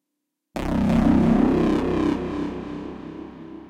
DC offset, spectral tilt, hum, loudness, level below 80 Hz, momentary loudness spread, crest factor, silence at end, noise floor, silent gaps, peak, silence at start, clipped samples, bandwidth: under 0.1%; -8 dB/octave; none; -21 LUFS; -36 dBFS; 18 LU; 16 dB; 0 s; -81 dBFS; none; -8 dBFS; 0.55 s; under 0.1%; 11 kHz